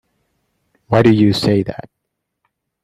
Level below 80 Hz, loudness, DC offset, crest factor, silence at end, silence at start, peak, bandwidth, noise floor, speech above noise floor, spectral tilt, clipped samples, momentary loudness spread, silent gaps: -48 dBFS; -14 LUFS; under 0.1%; 18 dB; 1 s; 0.9 s; 0 dBFS; 13.5 kHz; -76 dBFS; 63 dB; -7 dB/octave; under 0.1%; 14 LU; none